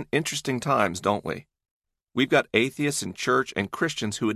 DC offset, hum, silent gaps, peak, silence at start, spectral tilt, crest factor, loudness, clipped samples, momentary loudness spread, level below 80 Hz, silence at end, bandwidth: under 0.1%; none; 1.71-1.80 s; -6 dBFS; 0 s; -4 dB/octave; 20 dB; -25 LUFS; under 0.1%; 7 LU; -58 dBFS; 0 s; 14.5 kHz